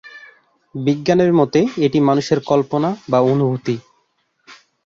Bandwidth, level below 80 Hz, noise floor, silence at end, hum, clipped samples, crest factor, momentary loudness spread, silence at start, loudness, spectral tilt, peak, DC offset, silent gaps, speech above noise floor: 7.6 kHz; -56 dBFS; -65 dBFS; 0.3 s; none; under 0.1%; 16 dB; 9 LU; 0.05 s; -17 LUFS; -7 dB/octave; -2 dBFS; under 0.1%; none; 49 dB